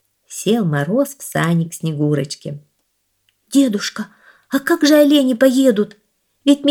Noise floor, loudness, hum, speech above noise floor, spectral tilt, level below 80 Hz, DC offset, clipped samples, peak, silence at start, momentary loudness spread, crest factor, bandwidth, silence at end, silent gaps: -67 dBFS; -16 LUFS; none; 52 dB; -5.5 dB/octave; -66 dBFS; under 0.1%; under 0.1%; 0 dBFS; 0.3 s; 15 LU; 16 dB; 18 kHz; 0 s; none